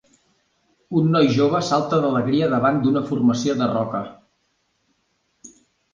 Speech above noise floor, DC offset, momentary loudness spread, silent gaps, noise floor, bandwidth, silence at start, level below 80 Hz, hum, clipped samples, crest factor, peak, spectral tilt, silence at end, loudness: 50 dB; under 0.1%; 8 LU; none; -69 dBFS; 7.6 kHz; 0.9 s; -58 dBFS; none; under 0.1%; 16 dB; -6 dBFS; -6.5 dB/octave; 0.45 s; -20 LUFS